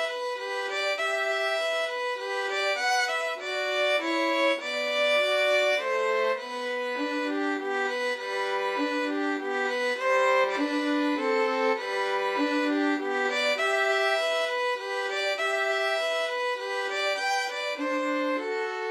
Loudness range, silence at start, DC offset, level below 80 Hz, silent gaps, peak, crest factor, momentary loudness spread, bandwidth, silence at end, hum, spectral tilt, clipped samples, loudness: 3 LU; 0 s; under 0.1%; -88 dBFS; none; -12 dBFS; 14 dB; 6 LU; 15 kHz; 0 s; none; -0.5 dB/octave; under 0.1%; -26 LUFS